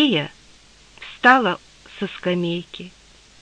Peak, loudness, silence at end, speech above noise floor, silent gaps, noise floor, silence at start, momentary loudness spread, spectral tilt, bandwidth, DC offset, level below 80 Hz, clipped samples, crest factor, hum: -2 dBFS; -20 LUFS; 0.55 s; 30 dB; none; -50 dBFS; 0 s; 24 LU; -5.5 dB/octave; 10 kHz; under 0.1%; -58 dBFS; under 0.1%; 20 dB; none